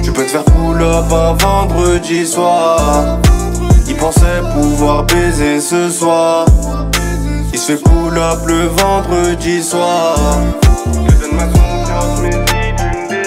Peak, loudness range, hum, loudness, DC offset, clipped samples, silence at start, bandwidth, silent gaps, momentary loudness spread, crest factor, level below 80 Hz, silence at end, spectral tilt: 0 dBFS; 1 LU; none; -12 LUFS; under 0.1%; under 0.1%; 0 s; 16 kHz; none; 4 LU; 10 dB; -16 dBFS; 0 s; -5 dB/octave